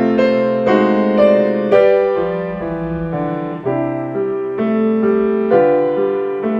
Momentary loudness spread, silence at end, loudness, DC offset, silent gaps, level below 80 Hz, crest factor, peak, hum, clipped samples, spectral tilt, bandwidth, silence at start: 9 LU; 0 s; -15 LUFS; under 0.1%; none; -46 dBFS; 14 dB; 0 dBFS; none; under 0.1%; -9 dB/octave; 7 kHz; 0 s